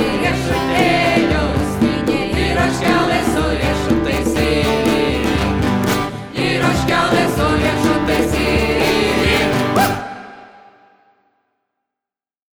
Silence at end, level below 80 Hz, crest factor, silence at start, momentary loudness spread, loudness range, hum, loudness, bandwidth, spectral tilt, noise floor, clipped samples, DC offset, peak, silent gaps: 2.1 s; -30 dBFS; 16 dB; 0 s; 4 LU; 3 LU; none; -16 LUFS; over 20 kHz; -5 dB/octave; -88 dBFS; under 0.1%; under 0.1%; -2 dBFS; none